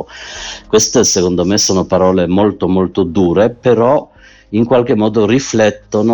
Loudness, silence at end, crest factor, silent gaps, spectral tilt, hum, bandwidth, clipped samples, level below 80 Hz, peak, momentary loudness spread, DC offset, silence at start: -12 LUFS; 0 s; 12 dB; none; -4.5 dB/octave; none; 19 kHz; under 0.1%; -42 dBFS; 0 dBFS; 6 LU; under 0.1%; 0 s